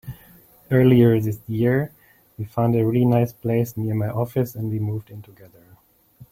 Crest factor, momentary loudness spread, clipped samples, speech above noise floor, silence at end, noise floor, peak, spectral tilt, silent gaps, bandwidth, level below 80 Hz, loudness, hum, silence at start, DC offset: 18 dB; 17 LU; under 0.1%; 35 dB; 0.1 s; -55 dBFS; -4 dBFS; -9 dB/octave; none; 16.5 kHz; -54 dBFS; -21 LUFS; none; 0.05 s; under 0.1%